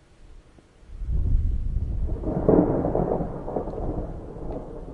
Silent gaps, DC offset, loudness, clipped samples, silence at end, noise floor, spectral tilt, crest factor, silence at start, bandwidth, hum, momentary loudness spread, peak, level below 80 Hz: none; under 0.1%; -27 LUFS; under 0.1%; 0 s; -52 dBFS; -11.5 dB/octave; 22 dB; 0.2 s; 3.4 kHz; none; 15 LU; -4 dBFS; -30 dBFS